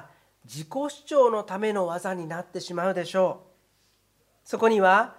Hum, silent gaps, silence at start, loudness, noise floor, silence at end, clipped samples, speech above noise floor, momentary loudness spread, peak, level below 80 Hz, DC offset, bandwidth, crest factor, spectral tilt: none; none; 0 s; -25 LUFS; -67 dBFS; 0.05 s; under 0.1%; 42 dB; 15 LU; -6 dBFS; -76 dBFS; under 0.1%; 15 kHz; 20 dB; -5 dB/octave